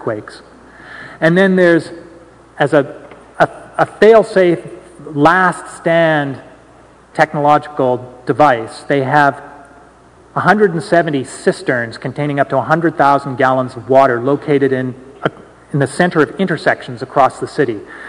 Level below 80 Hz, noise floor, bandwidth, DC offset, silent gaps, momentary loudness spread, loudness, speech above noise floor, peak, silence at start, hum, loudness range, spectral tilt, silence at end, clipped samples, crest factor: -52 dBFS; -44 dBFS; 12 kHz; under 0.1%; none; 13 LU; -14 LUFS; 30 dB; 0 dBFS; 0 s; none; 3 LU; -6.5 dB/octave; 0 s; 0.4%; 14 dB